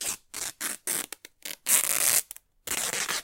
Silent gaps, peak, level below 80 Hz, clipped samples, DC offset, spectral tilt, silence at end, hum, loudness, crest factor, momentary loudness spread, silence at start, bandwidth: none; -2 dBFS; -66 dBFS; under 0.1%; under 0.1%; 1.5 dB/octave; 0 s; none; -26 LUFS; 26 dB; 18 LU; 0 s; 17 kHz